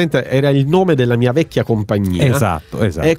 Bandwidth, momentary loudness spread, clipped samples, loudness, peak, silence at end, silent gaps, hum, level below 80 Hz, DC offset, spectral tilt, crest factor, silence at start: 16 kHz; 5 LU; under 0.1%; -15 LUFS; -2 dBFS; 0 s; none; none; -38 dBFS; under 0.1%; -7 dB/octave; 12 dB; 0 s